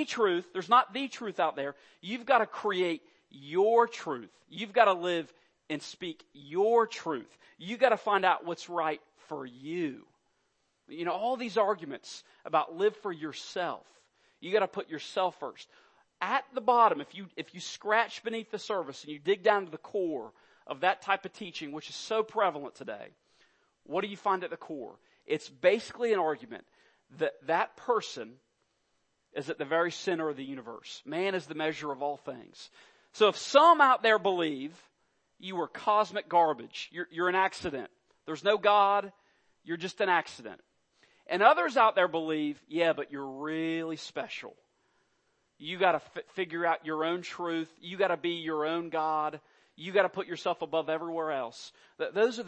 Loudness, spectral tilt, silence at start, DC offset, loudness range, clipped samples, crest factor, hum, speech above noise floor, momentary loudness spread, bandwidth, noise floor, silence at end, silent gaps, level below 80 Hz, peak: -30 LUFS; -4 dB/octave; 0 s; under 0.1%; 8 LU; under 0.1%; 24 dB; none; 46 dB; 18 LU; 8.8 kHz; -76 dBFS; 0 s; none; -78 dBFS; -6 dBFS